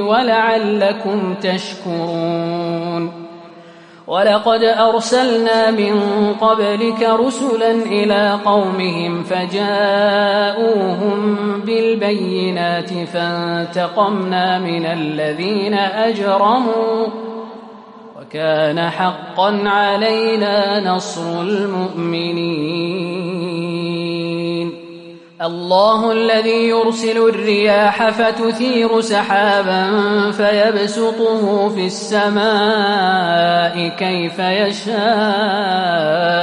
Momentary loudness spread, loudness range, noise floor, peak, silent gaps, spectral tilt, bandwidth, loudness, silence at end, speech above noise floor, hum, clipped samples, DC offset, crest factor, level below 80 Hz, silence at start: 8 LU; 5 LU; -40 dBFS; -2 dBFS; none; -5 dB/octave; 11 kHz; -16 LUFS; 0 s; 25 dB; none; under 0.1%; under 0.1%; 14 dB; -64 dBFS; 0 s